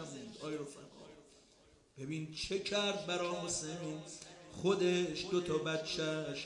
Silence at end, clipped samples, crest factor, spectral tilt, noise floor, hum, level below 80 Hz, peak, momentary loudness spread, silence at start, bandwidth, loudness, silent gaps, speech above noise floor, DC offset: 0 s; under 0.1%; 20 dB; -4 dB/octave; -66 dBFS; none; -68 dBFS; -20 dBFS; 17 LU; 0 s; 11.5 kHz; -37 LUFS; none; 29 dB; under 0.1%